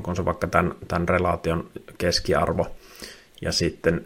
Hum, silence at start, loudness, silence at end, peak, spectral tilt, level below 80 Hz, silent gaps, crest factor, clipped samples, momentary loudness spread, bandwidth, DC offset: none; 0 s; -24 LUFS; 0 s; -2 dBFS; -5 dB/octave; -44 dBFS; none; 24 dB; under 0.1%; 18 LU; 16.5 kHz; under 0.1%